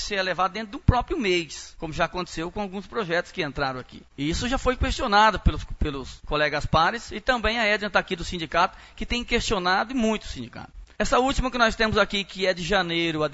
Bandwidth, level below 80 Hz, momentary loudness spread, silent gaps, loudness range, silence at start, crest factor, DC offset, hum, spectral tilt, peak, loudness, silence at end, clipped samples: 8 kHz; -36 dBFS; 10 LU; none; 4 LU; 0 s; 22 dB; under 0.1%; none; -4.5 dB/octave; -2 dBFS; -24 LUFS; 0 s; under 0.1%